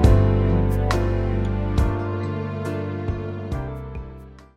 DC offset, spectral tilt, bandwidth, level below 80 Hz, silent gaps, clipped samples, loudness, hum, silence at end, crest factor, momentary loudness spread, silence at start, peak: under 0.1%; -8 dB/octave; 11.5 kHz; -26 dBFS; none; under 0.1%; -23 LUFS; none; 0.15 s; 16 dB; 14 LU; 0 s; -4 dBFS